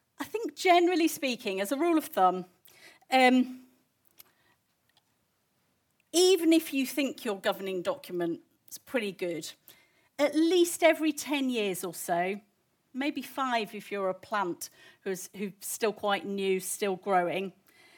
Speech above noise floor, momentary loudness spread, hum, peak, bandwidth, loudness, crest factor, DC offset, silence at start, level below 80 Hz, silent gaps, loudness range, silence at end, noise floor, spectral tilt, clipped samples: 46 dB; 15 LU; none; -8 dBFS; 19 kHz; -29 LUFS; 22 dB; under 0.1%; 0.2 s; -84 dBFS; none; 5 LU; 0.45 s; -74 dBFS; -3.5 dB/octave; under 0.1%